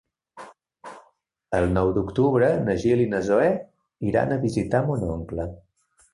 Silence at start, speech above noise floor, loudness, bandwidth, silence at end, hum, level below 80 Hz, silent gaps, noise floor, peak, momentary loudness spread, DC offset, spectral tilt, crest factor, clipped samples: 0.35 s; 41 dB; -23 LUFS; 11.5 kHz; 0.55 s; none; -44 dBFS; none; -63 dBFS; -6 dBFS; 11 LU; under 0.1%; -8 dB/octave; 18 dB; under 0.1%